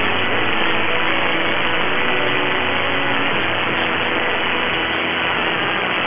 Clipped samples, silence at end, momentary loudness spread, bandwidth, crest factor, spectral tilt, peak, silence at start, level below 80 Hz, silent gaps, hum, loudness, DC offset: under 0.1%; 0 s; 1 LU; 4 kHz; 16 dB; -7.5 dB/octave; -2 dBFS; 0 s; -44 dBFS; none; none; -17 LUFS; 6%